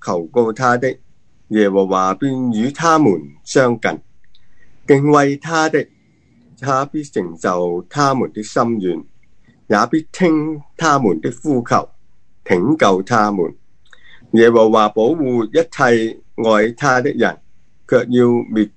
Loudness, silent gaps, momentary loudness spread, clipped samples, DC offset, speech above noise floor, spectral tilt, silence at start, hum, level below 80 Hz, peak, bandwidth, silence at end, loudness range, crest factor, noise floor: -16 LUFS; none; 9 LU; under 0.1%; 0.8%; 40 dB; -6 dB/octave; 0.05 s; none; -56 dBFS; 0 dBFS; 9.6 kHz; 0.1 s; 4 LU; 16 dB; -55 dBFS